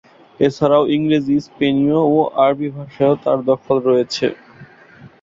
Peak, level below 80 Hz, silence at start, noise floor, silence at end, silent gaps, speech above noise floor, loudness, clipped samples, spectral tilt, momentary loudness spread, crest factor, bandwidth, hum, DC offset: -2 dBFS; -56 dBFS; 0.4 s; -43 dBFS; 0.15 s; none; 28 dB; -17 LUFS; under 0.1%; -7 dB/octave; 6 LU; 16 dB; 7.6 kHz; none; under 0.1%